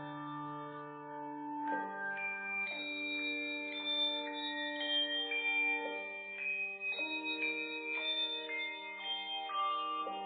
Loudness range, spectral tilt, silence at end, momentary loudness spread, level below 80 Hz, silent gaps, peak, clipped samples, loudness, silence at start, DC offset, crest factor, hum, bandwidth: 4 LU; 1 dB/octave; 0 s; 11 LU; under -90 dBFS; none; -24 dBFS; under 0.1%; -36 LUFS; 0 s; under 0.1%; 14 dB; none; 4.7 kHz